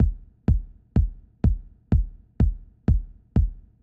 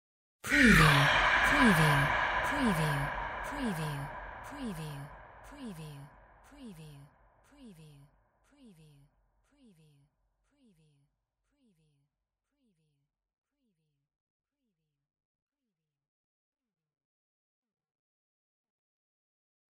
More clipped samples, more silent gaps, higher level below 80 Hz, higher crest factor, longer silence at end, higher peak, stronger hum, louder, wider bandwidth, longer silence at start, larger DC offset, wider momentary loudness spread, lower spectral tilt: neither; neither; first, -26 dBFS vs -50 dBFS; second, 14 dB vs 24 dB; second, 0.25 s vs 12 s; about the same, -10 dBFS vs -10 dBFS; neither; about the same, -27 LUFS vs -27 LUFS; second, 3 kHz vs 16 kHz; second, 0 s vs 0.45 s; neither; second, 5 LU vs 24 LU; first, -11 dB/octave vs -5 dB/octave